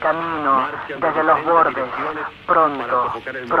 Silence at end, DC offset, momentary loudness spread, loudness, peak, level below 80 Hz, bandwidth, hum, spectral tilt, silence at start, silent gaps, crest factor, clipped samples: 0 s; under 0.1%; 9 LU; -19 LUFS; -2 dBFS; -56 dBFS; 7.6 kHz; none; -7 dB/octave; 0 s; none; 16 dB; under 0.1%